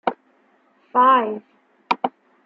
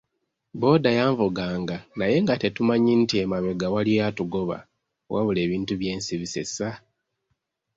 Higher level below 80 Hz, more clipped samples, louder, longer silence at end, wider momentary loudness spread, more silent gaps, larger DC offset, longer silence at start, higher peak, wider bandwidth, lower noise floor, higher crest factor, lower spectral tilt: second, -76 dBFS vs -54 dBFS; neither; first, -20 LUFS vs -24 LUFS; second, 0.35 s vs 1 s; first, 14 LU vs 11 LU; neither; neither; second, 0.05 s vs 0.55 s; about the same, -4 dBFS vs -6 dBFS; second, 6.8 kHz vs 8 kHz; second, -60 dBFS vs -78 dBFS; about the same, 20 dB vs 18 dB; about the same, -5.5 dB/octave vs -6 dB/octave